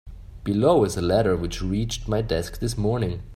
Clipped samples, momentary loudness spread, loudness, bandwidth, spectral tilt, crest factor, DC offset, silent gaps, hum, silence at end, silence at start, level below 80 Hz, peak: under 0.1%; 8 LU; -24 LUFS; 15.5 kHz; -6 dB/octave; 16 dB; under 0.1%; none; none; 0 s; 0.05 s; -38 dBFS; -6 dBFS